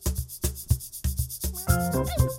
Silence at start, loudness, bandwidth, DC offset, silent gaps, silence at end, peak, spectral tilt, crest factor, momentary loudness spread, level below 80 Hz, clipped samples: 0 s; -28 LUFS; 17 kHz; under 0.1%; none; 0 s; -8 dBFS; -5 dB/octave; 18 dB; 6 LU; -32 dBFS; under 0.1%